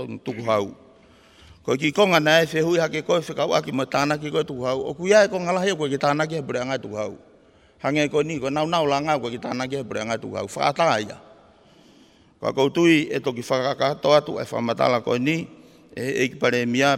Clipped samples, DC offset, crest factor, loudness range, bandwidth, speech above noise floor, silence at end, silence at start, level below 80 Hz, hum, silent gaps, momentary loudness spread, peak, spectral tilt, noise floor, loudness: under 0.1%; under 0.1%; 20 dB; 4 LU; 16 kHz; 32 dB; 0 s; 0 s; -62 dBFS; none; none; 11 LU; -4 dBFS; -5 dB/octave; -54 dBFS; -22 LUFS